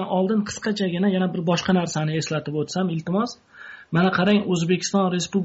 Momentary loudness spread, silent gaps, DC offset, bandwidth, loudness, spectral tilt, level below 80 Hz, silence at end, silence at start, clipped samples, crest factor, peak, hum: 7 LU; none; under 0.1%; 8 kHz; -23 LUFS; -5.5 dB/octave; -60 dBFS; 0 s; 0 s; under 0.1%; 16 dB; -6 dBFS; none